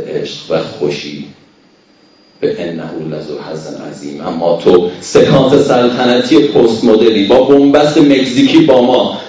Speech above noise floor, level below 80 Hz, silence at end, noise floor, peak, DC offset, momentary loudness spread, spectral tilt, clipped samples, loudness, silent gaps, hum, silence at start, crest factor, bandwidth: 37 dB; -46 dBFS; 0 s; -47 dBFS; 0 dBFS; under 0.1%; 16 LU; -6 dB/octave; 2%; -10 LUFS; none; none; 0 s; 10 dB; 8 kHz